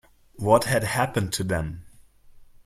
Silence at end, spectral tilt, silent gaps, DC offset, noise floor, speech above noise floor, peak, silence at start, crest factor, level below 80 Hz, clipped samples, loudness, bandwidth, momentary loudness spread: 0.2 s; -5 dB/octave; none; under 0.1%; -51 dBFS; 27 dB; -4 dBFS; 0.35 s; 22 dB; -48 dBFS; under 0.1%; -24 LUFS; 16 kHz; 13 LU